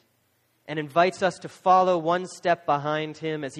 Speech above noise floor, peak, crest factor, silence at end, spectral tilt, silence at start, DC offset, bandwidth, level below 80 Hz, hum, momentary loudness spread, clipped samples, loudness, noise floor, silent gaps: 44 dB; -6 dBFS; 18 dB; 0 s; -5.5 dB/octave; 0.7 s; under 0.1%; 11.5 kHz; -70 dBFS; none; 11 LU; under 0.1%; -24 LUFS; -68 dBFS; none